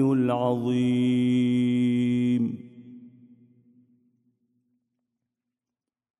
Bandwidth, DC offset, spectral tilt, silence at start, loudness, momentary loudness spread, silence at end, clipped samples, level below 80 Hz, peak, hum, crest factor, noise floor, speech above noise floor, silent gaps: 10.5 kHz; under 0.1%; -8 dB/octave; 0 s; -24 LUFS; 6 LU; 3.1 s; under 0.1%; -70 dBFS; -12 dBFS; none; 16 dB; -89 dBFS; 67 dB; none